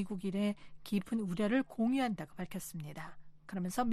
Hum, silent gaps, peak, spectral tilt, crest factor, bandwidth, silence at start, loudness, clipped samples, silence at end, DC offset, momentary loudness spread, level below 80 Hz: none; none; -20 dBFS; -6 dB/octave; 16 dB; 14.5 kHz; 0 s; -37 LUFS; under 0.1%; 0 s; under 0.1%; 13 LU; -62 dBFS